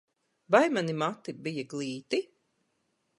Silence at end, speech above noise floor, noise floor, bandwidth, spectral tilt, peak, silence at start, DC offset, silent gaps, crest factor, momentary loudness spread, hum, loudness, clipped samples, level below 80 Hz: 0.95 s; 48 dB; -76 dBFS; 11.5 kHz; -5.5 dB/octave; -8 dBFS; 0.5 s; under 0.1%; none; 24 dB; 12 LU; none; -30 LUFS; under 0.1%; -80 dBFS